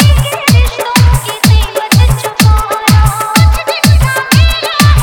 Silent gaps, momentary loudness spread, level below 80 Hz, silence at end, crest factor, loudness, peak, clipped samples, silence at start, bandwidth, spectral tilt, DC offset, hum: none; 2 LU; -14 dBFS; 0 s; 8 dB; -9 LUFS; 0 dBFS; 1%; 0 s; over 20 kHz; -4.5 dB/octave; 0.5%; none